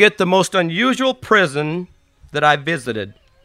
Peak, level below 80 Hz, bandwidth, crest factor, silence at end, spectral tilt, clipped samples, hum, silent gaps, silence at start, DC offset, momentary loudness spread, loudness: 0 dBFS; -56 dBFS; 15 kHz; 18 dB; 0.3 s; -4.5 dB/octave; under 0.1%; none; none; 0 s; under 0.1%; 13 LU; -17 LUFS